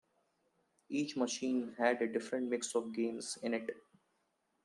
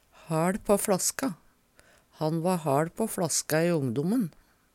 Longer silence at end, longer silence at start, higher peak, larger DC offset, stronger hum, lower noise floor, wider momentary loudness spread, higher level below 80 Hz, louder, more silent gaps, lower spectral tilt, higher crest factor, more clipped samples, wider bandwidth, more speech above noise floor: first, 0.85 s vs 0.45 s; first, 0.9 s vs 0.3 s; second, -18 dBFS vs -10 dBFS; neither; neither; first, -80 dBFS vs -61 dBFS; about the same, 7 LU vs 8 LU; second, -86 dBFS vs -60 dBFS; second, -37 LUFS vs -28 LUFS; neither; second, -3.5 dB/octave vs -5 dB/octave; about the same, 22 dB vs 20 dB; neither; second, 12.5 kHz vs 18.5 kHz; first, 44 dB vs 34 dB